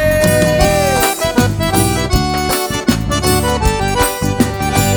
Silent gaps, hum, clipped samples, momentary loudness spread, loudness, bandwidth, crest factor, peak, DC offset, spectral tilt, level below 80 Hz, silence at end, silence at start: none; none; under 0.1%; 4 LU; -14 LUFS; over 20 kHz; 14 dB; 0 dBFS; under 0.1%; -4.5 dB/octave; -24 dBFS; 0 s; 0 s